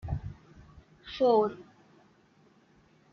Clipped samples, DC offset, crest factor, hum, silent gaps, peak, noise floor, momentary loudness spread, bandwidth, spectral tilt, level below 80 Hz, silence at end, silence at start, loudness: under 0.1%; under 0.1%; 20 dB; none; none; -14 dBFS; -63 dBFS; 26 LU; 6.6 kHz; -8 dB/octave; -52 dBFS; 1.5 s; 0.05 s; -28 LUFS